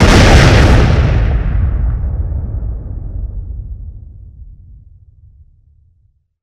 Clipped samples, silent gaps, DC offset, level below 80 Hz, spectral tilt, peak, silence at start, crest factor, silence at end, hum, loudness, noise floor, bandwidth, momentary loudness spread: 0.5%; none; under 0.1%; -16 dBFS; -6 dB/octave; 0 dBFS; 0 s; 12 dB; 1.65 s; none; -12 LUFS; -56 dBFS; 12.5 kHz; 21 LU